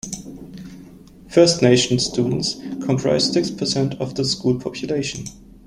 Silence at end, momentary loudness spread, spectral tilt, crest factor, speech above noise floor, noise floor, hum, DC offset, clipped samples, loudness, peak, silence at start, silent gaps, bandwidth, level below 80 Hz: 0.25 s; 21 LU; -4.5 dB/octave; 18 dB; 24 dB; -43 dBFS; none; under 0.1%; under 0.1%; -19 LUFS; -2 dBFS; 0.05 s; none; 13 kHz; -50 dBFS